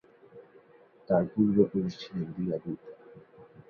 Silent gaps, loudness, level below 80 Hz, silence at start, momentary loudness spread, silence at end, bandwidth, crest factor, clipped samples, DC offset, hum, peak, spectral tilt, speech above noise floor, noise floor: none; -29 LUFS; -64 dBFS; 0.35 s; 16 LU; 0.25 s; 6.8 kHz; 20 dB; under 0.1%; under 0.1%; none; -10 dBFS; -9 dB/octave; 30 dB; -58 dBFS